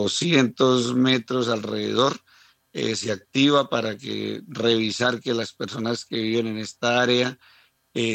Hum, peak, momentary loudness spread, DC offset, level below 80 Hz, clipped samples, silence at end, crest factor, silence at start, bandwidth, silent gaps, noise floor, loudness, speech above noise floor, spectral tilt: none; -6 dBFS; 10 LU; under 0.1%; -70 dBFS; under 0.1%; 0 s; 18 dB; 0 s; 9.2 kHz; none; -57 dBFS; -23 LUFS; 34 dB; -4.5 dB/octave